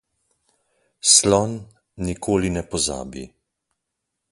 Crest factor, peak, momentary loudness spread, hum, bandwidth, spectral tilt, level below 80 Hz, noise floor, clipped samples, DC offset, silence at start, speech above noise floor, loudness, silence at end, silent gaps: 24 dB; 0 dBFS; 21 LU; none; 11.5 kHz; -3 dB/octave; -44 dBFS; -80 dBFS; under 0.1%; under 0.1%; 1.05 s; 60 dB; -19 LUFS; 1.05 s; none